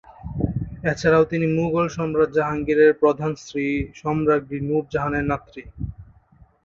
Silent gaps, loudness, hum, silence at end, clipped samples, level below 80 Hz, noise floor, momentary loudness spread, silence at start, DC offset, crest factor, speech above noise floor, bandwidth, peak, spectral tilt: none; -21 LUFS; none; 0.6 s; under 0.1%; -42 dBFS; -54 dBFS; 13 LU; 0.25 s; under 0.1%; 16 dB; 33 dB; 7.4 kHz; -4 dBFS; -7.5 dB/octave